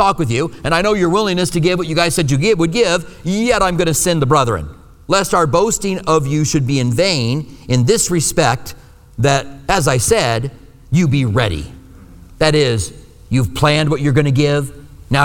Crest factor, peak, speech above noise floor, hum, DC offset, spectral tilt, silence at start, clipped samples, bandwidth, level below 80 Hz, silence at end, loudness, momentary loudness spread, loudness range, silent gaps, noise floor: 14 dB; 0 dBFS; 24 dB; none; under 0.1%; -4.5 dB/octave; 0 s; under 0.1%; 19.5 kHz; -34 dBFS; 0 s; -15 LUFS; 7 LU; 2 LU; none; -39 dBFS